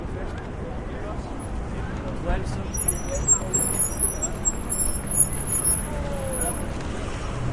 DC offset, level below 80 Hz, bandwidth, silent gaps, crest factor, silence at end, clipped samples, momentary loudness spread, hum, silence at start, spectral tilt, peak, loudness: under 0.1%; -32 dBFS; 11.5 kHz; none; 20 dB; 0 s; under 0.1%; 14 LU; none; 0 s; -4 dB/octave; -6 dBFS; -24 LUFS